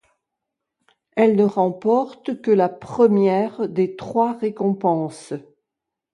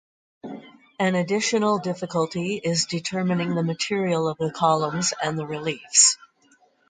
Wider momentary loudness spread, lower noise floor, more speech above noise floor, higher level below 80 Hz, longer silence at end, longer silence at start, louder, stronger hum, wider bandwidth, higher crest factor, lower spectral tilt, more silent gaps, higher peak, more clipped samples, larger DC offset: about the same, 12 LU vs 12 LU; first, -84 dBFS vs -60 dBFS; first, 64 dB vs 37 dB; about the same, -66 dBFS vs -66 dBFS; about the same, 0.75 s vs 0.75 s; first, 1.15 s vs 0.45 s; first, -20 LUFS vs -23 LUFS; neither; first, 11 kHz vs 9.6 kHz; second, 16 dB vs 22 dB; first, -8 dB/octave vs -3.5 dB/octave; neither; about the same, -4 dBFS vs -2 dBFS; neither; neither